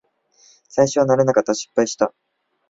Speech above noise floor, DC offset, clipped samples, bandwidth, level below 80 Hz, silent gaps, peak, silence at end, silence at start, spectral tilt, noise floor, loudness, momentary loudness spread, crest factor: 38 dB; under 0.1%; under 0.1%; 7.8 kHz; -60 dBFS; none; -2 dBFS; 0.6 s; 0.75 s; -5 dB/octave; -55 dBFS; -19 LUFS; 7 LU; 18 dB